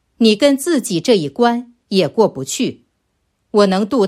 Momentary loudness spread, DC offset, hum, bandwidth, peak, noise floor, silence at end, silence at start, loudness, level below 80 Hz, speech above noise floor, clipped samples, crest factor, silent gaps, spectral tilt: 7 LU; under 0.1%; none; 15.5 kHz; 0 dBFS; -67 dBFS; 0 s; 0.2 s; -16 LUFS; -60 dBFS; 53 dB; under 0.1%; 16 dB; none; -4.5 dB/octave